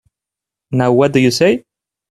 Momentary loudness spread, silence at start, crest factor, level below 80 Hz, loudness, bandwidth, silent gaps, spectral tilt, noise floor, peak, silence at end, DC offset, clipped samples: 9 LU; 0.7 s; 16 dB; -52 dBFS; -14 LUFS; 13.5 kHz; none; -6 dB/octave; -85 dBFS; 0 dBFS; 0.5 s; under 0.1%; under 0.1%